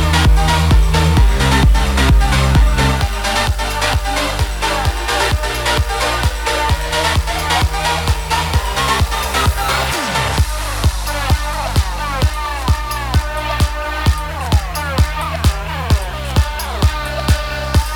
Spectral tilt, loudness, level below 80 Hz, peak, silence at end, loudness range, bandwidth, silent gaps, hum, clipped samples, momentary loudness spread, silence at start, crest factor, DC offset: -4.5 dB/octave; -16 LUFS; -18 dBFS; 0 dBFS; 0 s; 4 LU; 19.5 kHz; none; none; under 0.1%; 5 LU; 0 s; 14 dB; under 0.1%